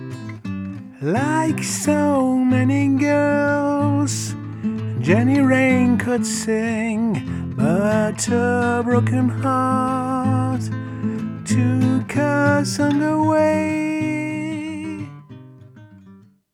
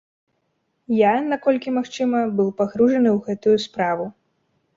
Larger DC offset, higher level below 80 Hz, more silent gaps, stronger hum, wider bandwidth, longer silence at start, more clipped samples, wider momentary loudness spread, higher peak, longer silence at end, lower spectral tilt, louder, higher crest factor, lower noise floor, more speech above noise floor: neither; first, -58 dBFS vs -64 dBFS; neither; neither; first, 15.5 kHz vs 7.6 kHz; second, 0 s vs 0.9 s; neither; first, 11 LU vs 7 LU; first, -2 dBFS vs -6 dBFS; second, 0.35 s vs 0.65 s; about the same, -6 dB/octave vs -6.5 dB/octave; about the same, -19 LUFS vs -20 LUFS; about the same, 16 dB vs 16 dB; second, -47 dBFS vs -71 dBFS; second, 29 dB vs 52 dB